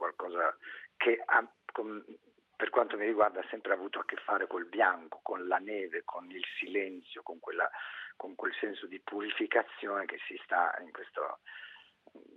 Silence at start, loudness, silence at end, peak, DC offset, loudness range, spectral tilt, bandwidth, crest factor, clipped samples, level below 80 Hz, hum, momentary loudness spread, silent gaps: 0 s; -34 LUFS; 0.15 s; -12 dBFS; under 0.1%; 5 LU; -5.5 dB/octave; 4.7 kHz; 24 dB; under 0.1%; -90 dBFS; none; 14 LU; none